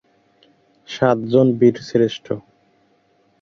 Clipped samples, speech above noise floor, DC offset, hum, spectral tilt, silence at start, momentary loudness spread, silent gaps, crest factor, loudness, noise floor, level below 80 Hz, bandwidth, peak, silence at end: under 0.1%; 43 dB; under 0.1%; none; -7.5 dB/octave; 0.9 s; 15 LU; none; 18 dB; -18 LUFS; -60 dBFS; -58 dBFS; 7.2 kHz; -2 dBFS; 1 s